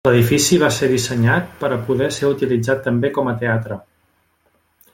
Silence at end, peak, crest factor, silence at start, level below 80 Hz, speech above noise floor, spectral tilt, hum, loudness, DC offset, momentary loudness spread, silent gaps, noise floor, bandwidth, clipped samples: 1.15 s; -2 dBFS; 16 dB; 0.05 s; -50 dBFS; 45 dB; -5 dB/octave; none; -17 LUFS; under 0.1%; 8 LU; none; -62 dBFS; 16.5 kHz; under 0.1%